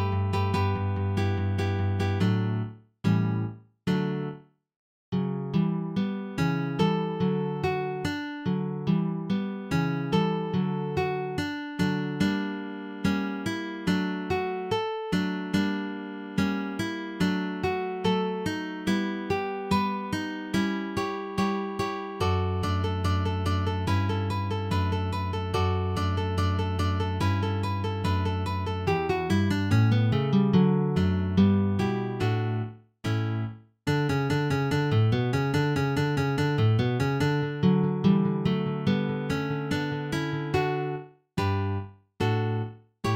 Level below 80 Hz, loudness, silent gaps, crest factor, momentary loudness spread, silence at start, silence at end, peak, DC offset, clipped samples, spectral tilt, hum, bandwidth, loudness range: -52 dBFS; -27 LUFS; 4.76-5.12 s; 16 dB; 7 LU; 0 s; 0 s; -10 dBFS; under 0.1%; under 0.1%; -7 dB/octave; none; 15.5 kHz; 4 LU